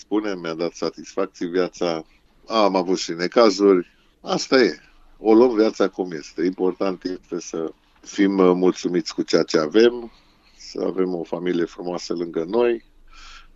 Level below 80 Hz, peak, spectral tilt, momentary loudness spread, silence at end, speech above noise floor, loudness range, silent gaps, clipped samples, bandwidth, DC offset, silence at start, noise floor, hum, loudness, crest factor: -56 dBFS; -2 dBFS; -5 dB/octave; 13 LU; 0.15 s; 23 dB; 5 LU; none; under 0.1%; 7.8 kHz; under 0.1%; 0.1 s; -43 dBFS; none; -21 LUFS; 20 dB